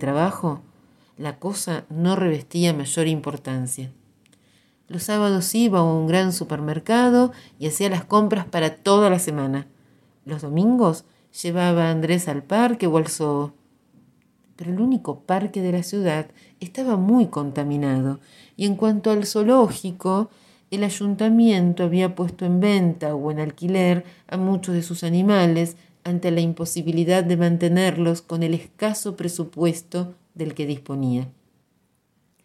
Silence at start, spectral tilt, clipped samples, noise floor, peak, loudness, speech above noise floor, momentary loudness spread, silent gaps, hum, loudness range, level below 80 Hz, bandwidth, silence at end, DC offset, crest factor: 0 s; -6 dB/octave; under 0.1%; -66 dBFS; -4 dBFS; -22 LUFS; 45 dB; 12 LU; none; none; 5 LU; -64 dBFS; 14.5 kHz; 1.15 s; under 0.1%; 18 dB